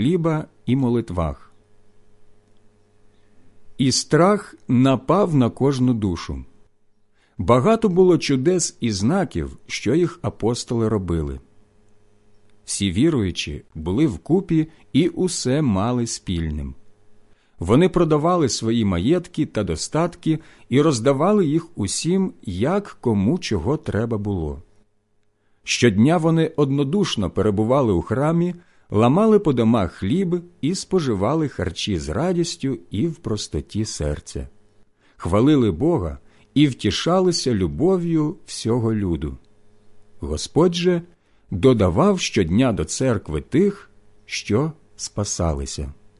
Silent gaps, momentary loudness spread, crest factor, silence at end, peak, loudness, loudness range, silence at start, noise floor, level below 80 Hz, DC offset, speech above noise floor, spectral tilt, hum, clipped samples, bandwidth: none; 11 LU; 18 dB; 0.25 s; -4 dBFS; -20 LUFS; 5 LU; 0 s; -63 dBFS; -38 dBFS; under 0.1%; 43 dB; -6 dB/octave; none; under 0.1%; 11.5 kHz